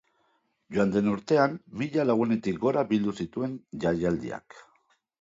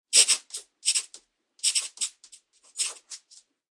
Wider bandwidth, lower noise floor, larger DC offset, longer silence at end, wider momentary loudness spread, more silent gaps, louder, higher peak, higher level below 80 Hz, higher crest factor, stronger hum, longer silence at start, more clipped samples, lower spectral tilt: second, 7.8 kHz vs 11.5 kHz; first, -71 dBFS vs -58 dBFS; neither; about the same, 0.6 s vs 0.55 s; second, 9 LU vs 23 LU; neither; about the same, -27 LUFS vs -25 LUFS; second, -8 dBFS vs -4 dBFS; first, -58 dBFS vs under -90 dBFS; second, 20 dB vs 26 dB; neither; first, 0.7 s vs 0.1 s; neither; first, -7.5 dB/octave vs 6 dB/octave